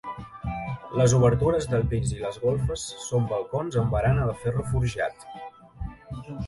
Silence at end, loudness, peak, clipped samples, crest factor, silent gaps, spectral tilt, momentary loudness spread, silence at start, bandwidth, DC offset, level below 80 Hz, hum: 0 s; -26 LUFS; -8 dBFS; under 0.1%; 16 dB; none; -6.5 dB/octave; 19 LU; 0.05 s; 11.5 kHz; under 0.1%; -40 dBFS; none